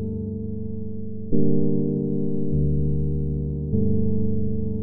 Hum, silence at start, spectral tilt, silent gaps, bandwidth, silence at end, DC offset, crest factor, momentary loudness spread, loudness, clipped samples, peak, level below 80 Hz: none; 0 s; -19.5 dB/octave; none; 1 kHz; 0 s; under 0.1%; 16 dB; 9 LU; -25 LUFS; under 0.1%; -4 dBFS; -34 dBFS